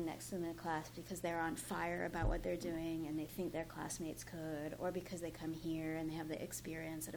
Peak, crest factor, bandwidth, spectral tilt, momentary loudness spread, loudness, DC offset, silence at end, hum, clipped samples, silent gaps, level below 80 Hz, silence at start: -26 dBFS; 16 dB; over 20 kHz; -5 dB/octave; 5 LU; -43 LUFS; under 0.1%; 0 s; none; under 0.1%; none; -54 dBFS; 0 s